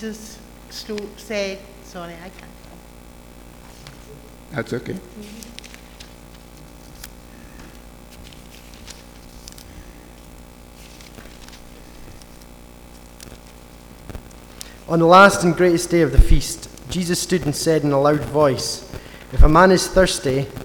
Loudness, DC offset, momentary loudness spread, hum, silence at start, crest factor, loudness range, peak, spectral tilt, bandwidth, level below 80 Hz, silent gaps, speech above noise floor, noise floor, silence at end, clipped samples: -17 LUFS; under 0.1%; 27 LU; 60 Hz at -50 dBFS; 0 s; 20 dB; 25 LU; 0 dBFS; -5 dB/octave; 19.5 kHz; -26 dBFS; none; 25 dB; -42 dBFS; 0 s; under 0.1%